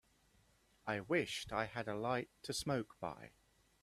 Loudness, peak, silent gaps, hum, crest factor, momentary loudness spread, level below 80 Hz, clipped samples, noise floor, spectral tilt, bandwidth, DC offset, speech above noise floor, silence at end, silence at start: -41 LUFS; -22 dBFS; none; none; 22 dB; 11 LU; -68 dBFS; under 0.1%; -73 dBFS; -4.5 dB/octave; 14.5 kHz; under 0.1%; 32 dB; 0.55 s; 0.85 s